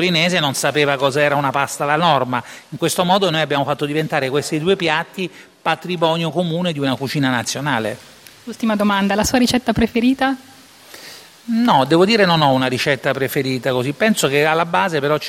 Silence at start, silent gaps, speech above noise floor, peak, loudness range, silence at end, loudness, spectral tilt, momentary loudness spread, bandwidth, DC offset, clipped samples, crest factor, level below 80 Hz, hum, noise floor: 0 s; none; 25 dB; 0 dBFS; 4 LU; 0 s; -17 LUFS; -4.5 dB/octave; 10 LU; 16.5 kHz; under 0.1%; under 0.1%; 18 dB; -48 dBFS; none; -42 dBFS